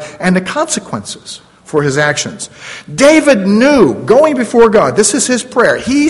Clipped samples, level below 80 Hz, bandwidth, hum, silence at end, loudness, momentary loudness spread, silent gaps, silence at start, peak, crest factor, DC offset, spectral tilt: 0.5%; -44 dBFS; 12 kHz; none; 0 s; -10 LUFS; 17 LU; none; 0 s; 0 dBFS; 10 dB; under 0.1%; -4 dB/octave